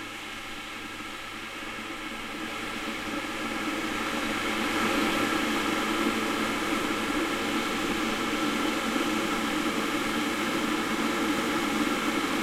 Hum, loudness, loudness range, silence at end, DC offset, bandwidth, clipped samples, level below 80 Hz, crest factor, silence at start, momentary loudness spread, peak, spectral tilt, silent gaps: none; -28 LUFS; 6 LU; 0 s; under 0.1%; 16.5 kHz; under 0.1%; -52 dBFS; 16 dB; 0 s; 10 LU; -14 dBFS; -3 dB/octave; none